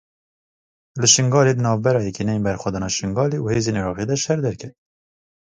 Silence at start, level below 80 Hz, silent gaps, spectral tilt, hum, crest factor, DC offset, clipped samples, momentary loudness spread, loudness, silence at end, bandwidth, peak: 0.95 s; -48 dBFS; none; -4 dB/octave; none; 20 dB; under 0.1%; under 0.1%; 11 LU; -19 LUFS; 0.7 s; 10 kHz; 0 dBFS